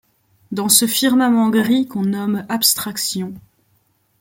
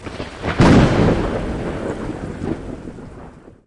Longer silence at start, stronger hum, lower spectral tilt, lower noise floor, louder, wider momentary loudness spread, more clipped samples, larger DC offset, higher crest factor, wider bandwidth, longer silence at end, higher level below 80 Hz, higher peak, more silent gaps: first, 0.5 s vs 0 s; neither; second, -3 dB/octave vs -7 dB/octave; first, -62 dBFS vs -39 dBFS; about the same, -16 LUFS vs -18 LUFS; second, 11 LU vs 22 LU; neither; neither; about the same, 18 dB vs 16 dB; first, 17 kHz vs 11 kHz; first, 0.8 s vs 0.15 s; second, -62 dBFS vs -30 dBFS; about the same, 0 dBFS vs -2 dBFS; neither